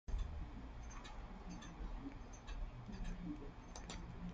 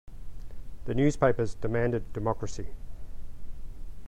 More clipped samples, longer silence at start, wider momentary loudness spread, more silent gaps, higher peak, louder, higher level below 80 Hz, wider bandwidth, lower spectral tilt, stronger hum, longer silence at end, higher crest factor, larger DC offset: neither; about the same, 0.1 s vs 0.05 s; second, 5 LU vs 23 LU; neither; second, -32 dBFS vs -10 dBFS; second, -52 LUFS vs -29 LUFS; second, -50 dBFS vs -40 dBFS; second, 9 kHz vs 10 kHz; second, -5.5 dB/octave vs -7 dB/octave; neither; about the same, 0 s vs 0 s; about the same, 16 dB vs 20 dB; neither